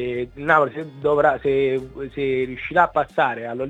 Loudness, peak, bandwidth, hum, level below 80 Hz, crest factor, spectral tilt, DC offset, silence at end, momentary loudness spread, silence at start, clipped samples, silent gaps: -21 LUFS; -2 dBFS; 8 kHz; none; -50 dBFS; 20 dB; -7 dB/octave; under 0.1%; 0 s; 8 LU; 0 s; under 0.1%; none